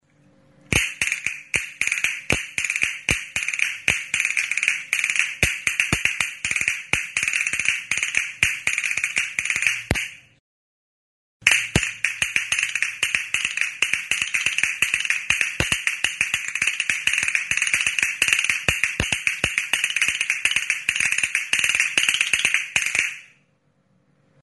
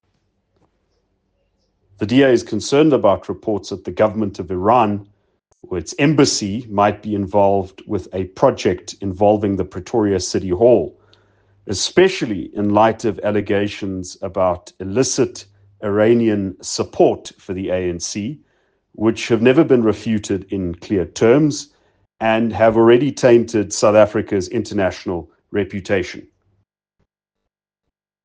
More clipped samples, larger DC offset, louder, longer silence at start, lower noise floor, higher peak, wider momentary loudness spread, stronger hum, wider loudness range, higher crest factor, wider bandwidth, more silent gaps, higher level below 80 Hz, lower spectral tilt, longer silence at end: neither; neither; second, -21 LUFS vs -17 LUFS; second, 0.7 s vs 2 s; second, -64 dBFS vs -80 dBFS; about the same, 0 dBFS vs 0 dBFS; second, 5 LU vs 13 LU; neither; about the same, 3 LU vs 4 LU; first, 24 dB vs 18 dB; first, 12 kHz vs 10 kHz; first, 10.40-11.40 s vs none; first, -46 dBFS vs -54 dBFS; second, -0.5 dB/octave vs -5.5 dB/octave; second, 1.15 s vs 2.05 s